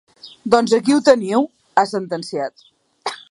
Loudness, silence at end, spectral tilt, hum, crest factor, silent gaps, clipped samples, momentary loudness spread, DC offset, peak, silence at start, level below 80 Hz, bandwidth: -17 LUFS; 0.15 s; -4.5 dB/octave; none; 18 dB; none; under 0.1%; 15 LU; under 0.1%; 0 dBFS; 0.25 s; -64 dBFS; 11.5 kHz